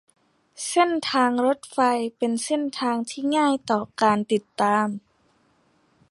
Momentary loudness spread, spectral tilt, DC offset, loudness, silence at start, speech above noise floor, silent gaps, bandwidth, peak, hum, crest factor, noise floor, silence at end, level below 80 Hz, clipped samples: 5 LU; -4 dB/octave; under 0.1%; -23 LUFS; 0.6 s; 41 dB; none; 11.5 kHz; -6 dBFS; none; 18 dB; -64 dBFS; 1.1 s; -68 dBFS; under 0.1%